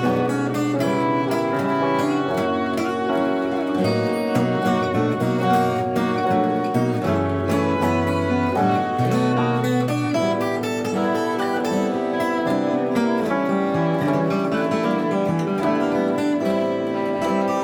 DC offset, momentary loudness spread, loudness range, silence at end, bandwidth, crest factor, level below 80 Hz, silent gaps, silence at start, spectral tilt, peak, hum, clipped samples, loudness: under 0.1%; 2 LU; 1 LU; 0 s; 19.5 kHz; 14 dB; -60 dBFS; none; 0 s; -6.5 dB/octave; -6 dBFS; none; under 0.1%; -21 LUFS